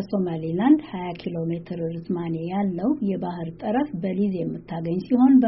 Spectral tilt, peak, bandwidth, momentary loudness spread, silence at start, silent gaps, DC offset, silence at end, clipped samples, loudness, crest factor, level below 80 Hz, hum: -8 dB/octave; -6 dBFS; 5.8 kHz; 11 LU; 0 s; none; under 0.1%; 0 s; under 0.1%; -25 LUFS; 16 dB; -58 dBFS; none